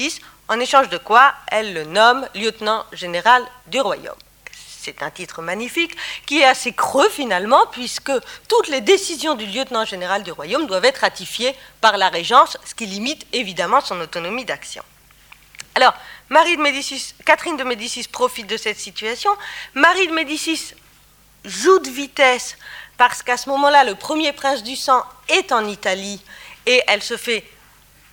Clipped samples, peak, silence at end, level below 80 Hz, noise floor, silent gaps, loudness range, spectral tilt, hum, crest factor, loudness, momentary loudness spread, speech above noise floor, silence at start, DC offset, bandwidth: under 0.1%; 0 dBFS; 0.7 s; -58 dBFS; -51 dBFS; none; 4 LU; -2 dB/octave; 50 Hz at -55 dBFS; 18 dB; -18 LUFS; 14 LU; 33 dB; 0 s; under 0.1%; 19.5 kHz